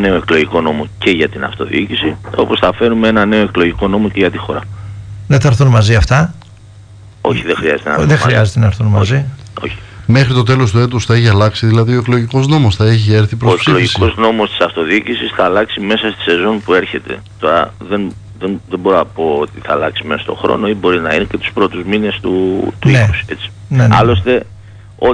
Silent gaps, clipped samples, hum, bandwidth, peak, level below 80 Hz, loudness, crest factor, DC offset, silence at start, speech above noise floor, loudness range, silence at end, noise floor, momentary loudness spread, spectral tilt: none; under 0.1%; none; 10 kHz; 0 dBFS; -32 dBFS; -12 LUFS; 12 dB; under 0.1%; 0 s; 25 dB; 4 LU; 0 s; -36 dBFS; 10 LU; -6.5 dB/octave